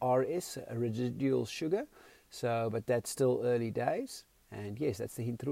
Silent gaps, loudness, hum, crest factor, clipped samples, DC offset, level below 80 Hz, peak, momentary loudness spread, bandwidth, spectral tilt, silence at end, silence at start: none; -34 LUFS; none; 16 dB; under 0.1%; under 0.1%; -70 dBFS; -18 dBFS; 14 LU; 16 kHz; -6 dB/octave; 0 s; 0 s